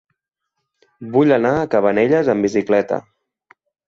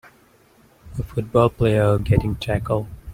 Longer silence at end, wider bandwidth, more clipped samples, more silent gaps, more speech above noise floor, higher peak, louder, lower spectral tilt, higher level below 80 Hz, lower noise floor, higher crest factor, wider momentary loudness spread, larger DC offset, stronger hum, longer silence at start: first, 0.85 s vs 0 s; second, 7.6 kHz vs 15.5 kHz; neither; neither; first, 61 dB vs 35 dB; about the same, -2 dBFS vs -2 dBFS; first, -17 LUFS vs -20 LUFS; about the same, -7 dB/octave vs -8 dB/octave; second, -54 dBFS vs -36 dBFS; first, -77 dBFS vs -55 dBFS; about the same, 16 dB vs 20 dB; about the same, 9 LU vs 11 LU; neither; neither; first, 1 s vs 0.85 s